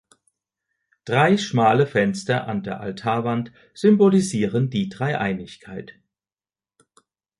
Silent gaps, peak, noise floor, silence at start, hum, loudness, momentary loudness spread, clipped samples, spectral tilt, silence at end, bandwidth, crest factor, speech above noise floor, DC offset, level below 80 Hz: none; -4 dBFS; under -90 dBFS; 1.05 s; none; -21 LUFS; 19 LU; under 0.1%; -6.5 dB/octave; 1.5 s; 11.5 kHz; 18 dB; over 69 dB; under 0.1%; -58 dBFS